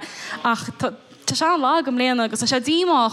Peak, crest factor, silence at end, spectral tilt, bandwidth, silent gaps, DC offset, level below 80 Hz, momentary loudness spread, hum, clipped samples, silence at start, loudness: -6 dBFS; 14 dB; 0 s; -3 dB/octave; 14 kHz; none; under 0.1%; -64 dBFS; 10 LU; none; under 0.1%; 0 s; -21 LUFS